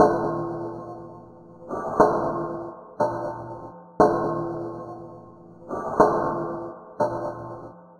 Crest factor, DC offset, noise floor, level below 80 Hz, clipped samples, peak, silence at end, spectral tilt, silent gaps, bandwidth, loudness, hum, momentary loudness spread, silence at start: 24 dB; under 0.1%; -46 dBFS; -52 dBFS; under 0.1%; -2 dBFS; 0.05 s; -8 dB/octave; none; 11.5 kHz; -25 LUFS; none; 20 LU; 0 s